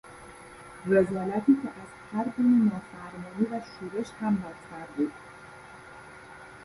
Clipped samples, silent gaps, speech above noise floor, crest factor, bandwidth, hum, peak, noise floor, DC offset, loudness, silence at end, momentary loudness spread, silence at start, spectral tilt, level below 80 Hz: under 0.1%; none; 20 dB; 20 dB; 11.5 kHz; none; -10 dBFS; -47 dBFS; under 0.1%; -28 LUFS; 0 s; 23 LU; 0.05 s; -8 dB/octave; -62 dBFS